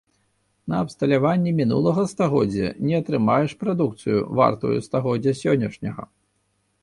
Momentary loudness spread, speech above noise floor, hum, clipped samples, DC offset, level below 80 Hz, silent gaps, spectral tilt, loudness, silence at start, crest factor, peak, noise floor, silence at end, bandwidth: 7 LU; 48 dB; none; under 0.1%; under 0.1%; -54 dBFS; none; -7.5 dB/octave; -22 LUFS; 0.65 s; 18 dB; -4 dBFS; -69 dBFS; 0.75 s; 11.5 kHz